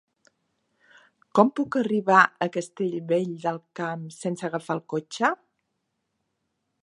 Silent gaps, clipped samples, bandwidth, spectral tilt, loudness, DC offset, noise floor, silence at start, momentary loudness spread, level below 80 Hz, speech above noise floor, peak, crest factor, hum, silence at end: none; under 0.1%; 11.5 kHz; -5.5 dB/octave; -25 LUFS; under 0.1%; -78 dBFS; 1.35 s; 14 LU; -78 dBFS; 54 dB; -2 dBFS; 24 dB; none; 1.45 s